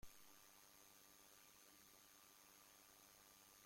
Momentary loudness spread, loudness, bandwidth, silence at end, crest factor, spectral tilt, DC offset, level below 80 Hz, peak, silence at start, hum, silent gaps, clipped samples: 0 LU; -66 LUFS; 16.5 kHz; 0 s; 20 dB; -1 dB/octave; under 0.1%; -80 dBFS; -46 dBFS; 0 s; none; none; under 0.1%